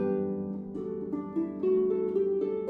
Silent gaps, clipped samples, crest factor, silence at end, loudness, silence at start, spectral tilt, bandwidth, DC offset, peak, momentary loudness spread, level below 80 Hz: none; under 0.1%; 12 dB; 0 s; -30 LUFS; 0 s; -11 dB/octave; 3.6 kHz; under 0.1%; -18 dBFS; 9 LU; -66 dBFS